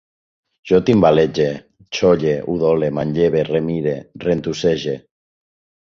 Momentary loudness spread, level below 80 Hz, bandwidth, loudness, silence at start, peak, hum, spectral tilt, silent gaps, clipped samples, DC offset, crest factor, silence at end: 11 LU; -48 dBFS; 7.4 kHz; -18 LUFS; 0.65 s; -2 dBFS; none; -6.5 dB/octave; none; under 0.1%; under 0.1%; 18 dB; 0.85 s